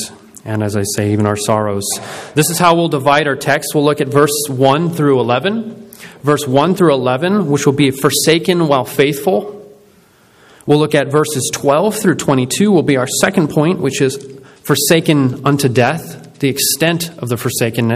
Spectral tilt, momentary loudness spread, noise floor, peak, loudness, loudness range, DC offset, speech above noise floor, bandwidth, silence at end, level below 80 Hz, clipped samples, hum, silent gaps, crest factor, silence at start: -4.5 dB/octave; 8 LU; -48 dBFS; 0 dBFS; -14 LUFS; 2 LU; under 0.1%; 35 dB; 16 kHz; 0 s; -52 dBFS; under 0.1%; none; none; 14 dB; 0 s